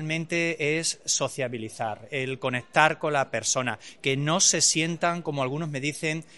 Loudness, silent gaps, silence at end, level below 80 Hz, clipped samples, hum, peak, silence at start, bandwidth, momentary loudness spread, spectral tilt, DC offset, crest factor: -25 LUFS; none; 0 s; -68 dBFS; under 0.1%; none; -4 dBFS; 0 s; 11.5 kHz; 11 LU; -2.5 dB/octave; 0.2%; 24 dB